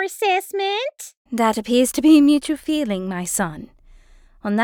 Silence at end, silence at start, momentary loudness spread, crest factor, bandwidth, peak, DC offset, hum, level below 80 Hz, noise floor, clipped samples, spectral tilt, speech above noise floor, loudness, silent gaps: 0 s; 0 s; 16 LU; 16 dB; 19 kHz; -4 dBFS; under 0.1%; none; -52 dBFS; -49 dBFS; under 0.1%; -4 dB/octave; 30 dB; -19 LUFS; 1.17-1.25 s